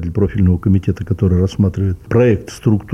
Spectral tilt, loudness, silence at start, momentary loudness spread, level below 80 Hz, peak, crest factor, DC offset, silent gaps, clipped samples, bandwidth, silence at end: -8.5 dB/octave; -16 LUFS; 0 s; 4 LU; -32 dBFS; -2 dBFS; 12 dB; under 0.1%; none; under 0.1%; 9.2 kHz; 0 s